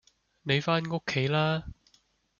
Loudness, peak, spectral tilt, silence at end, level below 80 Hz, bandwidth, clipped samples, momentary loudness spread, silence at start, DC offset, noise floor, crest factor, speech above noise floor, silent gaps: -28 LUFS; -12 dBFS; -6 dB/octave; 0.65 s; -58 dBFS; 7.2 kHz; under 0.1%; 11 LU; 0.45 s; under 0.1%; -68 dBFS; 20 dB; 40 dB; none